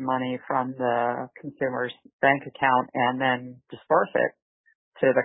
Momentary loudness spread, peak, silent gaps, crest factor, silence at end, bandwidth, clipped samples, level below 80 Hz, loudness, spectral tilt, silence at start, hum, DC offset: 10 LU; -6 dBFS; 2.13-2.19 s, 4.42-4.64 s, 4.75-4.92 s; 18 dB; 0 s; 4 kHz; under 0.1%; -72 dBFS; -25 LUFS; -10 dB/octave; 0 s; none; under 0.1%